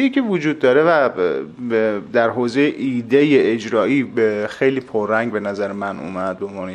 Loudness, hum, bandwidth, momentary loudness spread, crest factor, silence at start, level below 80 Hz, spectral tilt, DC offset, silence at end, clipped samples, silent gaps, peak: -18 LUFS; none; 9.4 kHz; 10 LU; 16 dB; 0 s; -58 dBFS; -6.5 dB/octave; under 0.1%; 0 s; under 0.1%; none; -2 dBFS